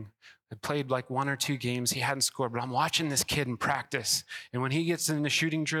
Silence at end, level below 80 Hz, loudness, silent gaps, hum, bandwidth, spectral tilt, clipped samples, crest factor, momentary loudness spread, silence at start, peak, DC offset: 0 s; -62 dBFS; -29 LUFS; none; none; 17 kHz; -3.5 dB/octave; under 0.1%; 18 dB; 7 LU; 0 s; -12 dBFS; under 0.1%